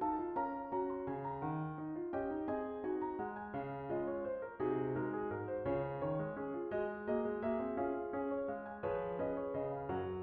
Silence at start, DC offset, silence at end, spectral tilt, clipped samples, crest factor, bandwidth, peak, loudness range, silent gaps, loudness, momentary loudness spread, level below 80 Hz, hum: 0 s; under 0.1%; 0 s; -7.5 dB/octave; under 0.1%; 14 dB; 4.2 kHz; -26 dBFS; 2 LU; none; -40 LUFS; 4 LU; -64 dBFS; none